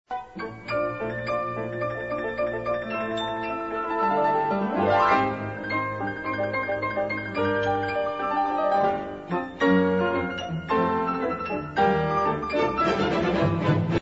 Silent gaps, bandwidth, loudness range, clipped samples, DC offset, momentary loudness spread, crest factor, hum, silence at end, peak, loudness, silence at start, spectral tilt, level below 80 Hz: none; 8 kHz; 4 LU; under 0.1%; under 0.1%; 8 LU; 16 dB; none; 0 s; -10 dBFS; -25 LUFS; 0.1 s; -7 dB/octave; -52 dBFS